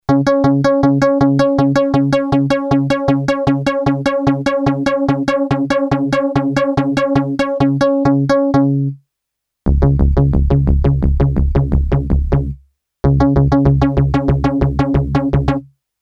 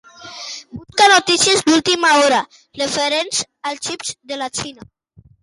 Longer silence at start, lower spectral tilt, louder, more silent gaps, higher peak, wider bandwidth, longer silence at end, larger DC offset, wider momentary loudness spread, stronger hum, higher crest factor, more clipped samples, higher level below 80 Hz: about the same, 0.1 s vs 0.2 s; first, -8.5 dB/octave vs -1.5 dB/octave; about the same, -15 LUFS vs -16 LUFS; neither; about the same, 0 dBFS vs 0 dBFS; second, 8.2 kHz vs 11.5 kHz; second, 0.35 s vs 0.7 s; neither; second, 4 LU vs 19 LU; neither; about the same, 14 dB vs 16 dB; neither; first, -22 dBFS vs -56 dBFS